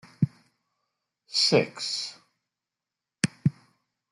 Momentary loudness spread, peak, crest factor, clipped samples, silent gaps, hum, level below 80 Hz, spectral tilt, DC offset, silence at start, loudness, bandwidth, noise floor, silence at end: 9 LU; -4 dBFS; 26 dB; under 0.1%; none; none; -70 dBFS; -4.5 dB/octave; under 0.1%; 0.2 s; -27 LUFS; 12 kHz; -88 dBFS; 0.6 s